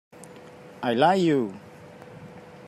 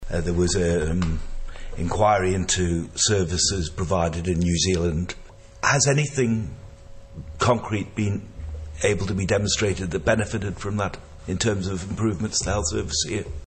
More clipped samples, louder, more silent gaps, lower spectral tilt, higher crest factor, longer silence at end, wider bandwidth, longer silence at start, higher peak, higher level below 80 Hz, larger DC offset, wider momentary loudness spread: neither; about the same, -23 LUFS vs -23 LUFS; neither; first, -6.5 dB/octave vs -4 dB/octave; about the same, 20 dB vs 18 dB; about the same, 0 s vs 0 s; first, 14 kHz vs 8.8 kHz; first, 0.2 s vs 0 s; second, -8 dBFS vs -4 dBFS; second, -72 dBFS vs -36 dBFS; neither; first, 26 LU vs 14 LU